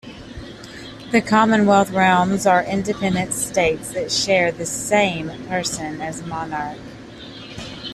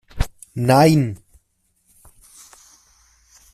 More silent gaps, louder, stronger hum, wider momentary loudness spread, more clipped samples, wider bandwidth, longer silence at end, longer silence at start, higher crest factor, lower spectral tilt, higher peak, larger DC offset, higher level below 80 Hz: neither; about the same, -19 LUFS vs -18 LUFS; neither; first, 20 LU vs 15 LU; neither; second, 14 kHz vs 15.5 kHz; second, 0 s vs 2.4 s; about the same, 0.05 s vs 0.15 s; about the same, 18 dB vs 20 dB; second, -4 dB/octave vs -6.5 dB/octave; about the same, -4 dBFS vs -2 dBFS; neither; second, -48 dBFS vs -34 dBFS